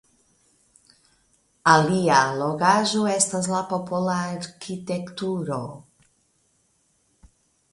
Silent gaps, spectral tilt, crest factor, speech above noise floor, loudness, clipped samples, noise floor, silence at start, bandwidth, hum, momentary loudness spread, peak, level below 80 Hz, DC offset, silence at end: none; -4 dB/octave; 24 dB; 44 dB; -22 LUFS; under 0.1%; -67 dBFS; 1.65 s; 11.5 kHz; none; 14 LU; -2 dBFS; -62 dBFS; under 0.1%; 1.95 s